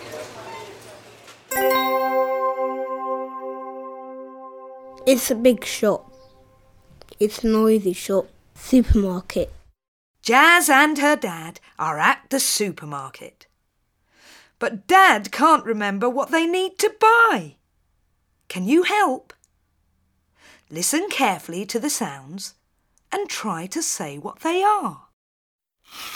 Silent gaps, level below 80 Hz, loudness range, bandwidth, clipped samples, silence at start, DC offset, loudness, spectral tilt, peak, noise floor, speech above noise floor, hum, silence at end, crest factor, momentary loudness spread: 9.88-10.14 s, 25.13-25.59 s; -40 dBFS; 8 LU; over 20 kHz; under 0.1%; 0 s; under 0.1%; -20 LUFS; -3.5 dB/octave; -2 dBFS; -70 dBFS; 50 dB; none; 0 s; 20 dB; 21 LU